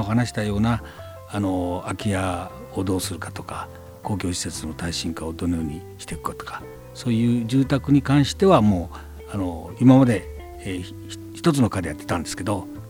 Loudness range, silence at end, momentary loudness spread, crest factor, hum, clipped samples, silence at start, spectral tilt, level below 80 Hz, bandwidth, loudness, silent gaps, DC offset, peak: 9 LU; 0 s; 18 LU; 20 dB; none; under 0.1%; 0 s; -6 dB/octave; -44 dBFS; 17 kHz; -23 LUFS; none; under 0.1%; -2 dBFS